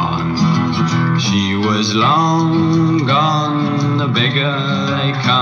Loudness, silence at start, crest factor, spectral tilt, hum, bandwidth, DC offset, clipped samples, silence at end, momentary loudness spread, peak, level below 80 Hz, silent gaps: -15 LUFS; 0 s; 14 dB; -5.5 dB/octave; none; 7.2 kHz; under 0.1%; under 0.1%; 0 s; 3 LU; 0 dBFS; -50 dBFS; none